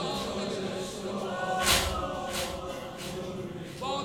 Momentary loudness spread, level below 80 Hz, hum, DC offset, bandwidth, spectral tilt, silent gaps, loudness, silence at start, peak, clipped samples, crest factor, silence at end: 13 LU; -48 dBFS; none; under 0.1%; over 20 kHz; -3 dB/octave; none; -31 LUFS; 0 s; -10 dBFS; under 0.1%; 22 dB; 0 s